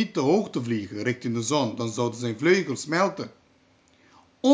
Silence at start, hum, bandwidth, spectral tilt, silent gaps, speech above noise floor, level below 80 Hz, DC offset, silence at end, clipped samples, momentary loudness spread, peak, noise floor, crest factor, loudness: 0 s; none; 8 kHz; -5 dB/octave; none; 36 dB; -66 dBFS; under 0.1%; 0 s; under 0.1%; 7 LU; -6 dBFS; -61 dBFS; 20 dB; -25 LUFS